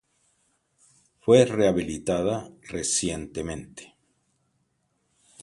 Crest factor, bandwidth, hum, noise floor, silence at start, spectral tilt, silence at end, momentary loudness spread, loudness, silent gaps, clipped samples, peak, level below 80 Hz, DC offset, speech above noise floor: 24 dB; 11.5 kHz; none; -73 dBFS; 1.25 s; -4.5 dB/octave; 1.6 s; 18 LU; -24 LUFS; none; under 0.1%; -4 dBFS; -52 dBFS; under 0.1%; 48 dB